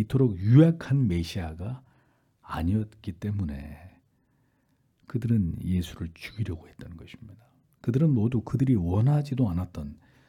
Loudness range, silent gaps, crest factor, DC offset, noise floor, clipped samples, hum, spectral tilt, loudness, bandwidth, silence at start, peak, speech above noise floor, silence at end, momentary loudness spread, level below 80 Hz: 8 LU; none; 20 dB; under 0.1%; -69 dBFS; under 0.1%; none; -9 dB/octave; -27 LUFS; 13.5 kHz; 0 s; -8 dBFS; 43 dB; 0.35 s; 19 LU; -50 dBFS